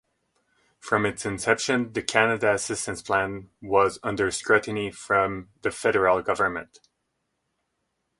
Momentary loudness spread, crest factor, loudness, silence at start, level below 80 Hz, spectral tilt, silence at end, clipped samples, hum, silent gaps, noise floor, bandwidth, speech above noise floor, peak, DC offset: 9 LU; 24 dB; -24 LUFS; 0.85 s; -56 dBFS; -4 dB/octave; 1.55 s; under 0.1%; none; none; -77 dBFS; 11.5 kHz; 53 dB; -2 dBFS; under 0.1%